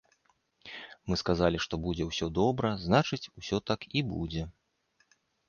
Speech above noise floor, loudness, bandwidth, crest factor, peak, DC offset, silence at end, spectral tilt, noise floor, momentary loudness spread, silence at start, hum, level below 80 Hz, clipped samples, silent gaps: 43 dB; -31 LUFS; 7.2 kHz; 22 dB; -10 dBFS; under 0.1%; 0.95 s; -6 dB/octave; -73 dBFS; 17 LU; 0.65 s; none; -50 dBFS; under 0.1%; none